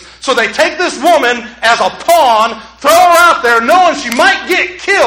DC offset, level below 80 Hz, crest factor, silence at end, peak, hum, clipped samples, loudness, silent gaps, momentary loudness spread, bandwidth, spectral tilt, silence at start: under 0.1%; -46 dBFS; 10 dB; 0 s; 0 dBFS; none; 0.3%; -9 LUFS; none; 7 LU; 19.5 kHz; -1.5 dB/octave; 0.2 s